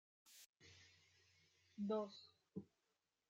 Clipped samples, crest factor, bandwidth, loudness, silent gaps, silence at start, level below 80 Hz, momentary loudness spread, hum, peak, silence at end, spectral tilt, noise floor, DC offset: under 0.1%; 20 dB; 16 kHz; -49 LUFS; 0.46-0.53 s; 0.25 s; under -90 dBFS; 22 LU; none; -32 dBFS; 0.65 s; -6 dB/octave; -89 dBFS; under 0.1%